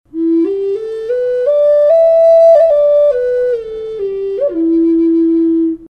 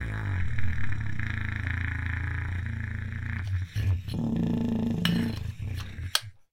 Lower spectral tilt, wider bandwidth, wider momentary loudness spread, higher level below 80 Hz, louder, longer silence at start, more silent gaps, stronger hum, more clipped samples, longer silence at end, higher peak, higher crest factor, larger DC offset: first, -7.5 dB/octave vs -5.5 dB/octave; second, 5.2 kHz vs 16.5 kHz; first, 12 LU vs 7 LU; second, -48 dBFS vs -40 dBFS; first, -11 LUFS vs -31 LUFS; first, 0.15 s vs 0 s; neither; neither; neither; second, 0 s vs 0.2 s; first, 0 dBFS vs -4 dBFS; second, 10 dB vs 24 dB; neither